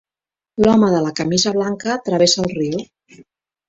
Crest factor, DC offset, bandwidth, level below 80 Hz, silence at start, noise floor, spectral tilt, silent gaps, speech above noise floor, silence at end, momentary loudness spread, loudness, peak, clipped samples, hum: 16 dB; under 0.1%; 8 kHz; -50 dBFS; 0.55 s; under -90 dBFS; -4.5 dB/octave; none; over 74 dB; 0.45 s; 9 LU; -17 LUFS; -2 dBFS; under 0.1%; none